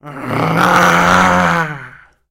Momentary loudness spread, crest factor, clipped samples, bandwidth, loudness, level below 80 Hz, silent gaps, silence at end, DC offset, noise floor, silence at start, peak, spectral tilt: 12 LU; 12 dB; under 0.1%; 16.5 kHz; -12 LUFS; -42 dBFS; none; 0.4 s; under 0.1%; -37 dBFS; 0.05 s; -2 dBFS; -4.5 dB/octave